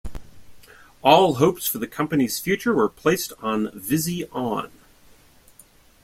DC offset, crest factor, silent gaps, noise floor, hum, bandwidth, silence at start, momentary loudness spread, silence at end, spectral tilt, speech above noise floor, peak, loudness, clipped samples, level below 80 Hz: under 0.1%; 22 dB; none; -53 dBFS; none; 16.5 kHz; 0.05 s; 11 LU; 1.35 s; -4.5 dB/octave; 32 dB; -2 dBFS; -22 LUFS; under 0.1%; -48 dBFS